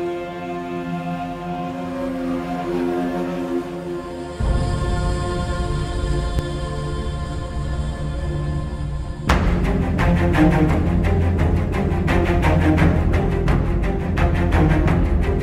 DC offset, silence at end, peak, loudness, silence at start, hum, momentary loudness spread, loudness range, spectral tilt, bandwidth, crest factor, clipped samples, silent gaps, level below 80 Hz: under 0.1%; 0 s; -4 dBFS; -21 LUFS; 0 s; none; 10 LU; 7 LU; -7.5 dB/octave; 12.5 kHz; 16 dB; under 0.1%; none; -24 dBFS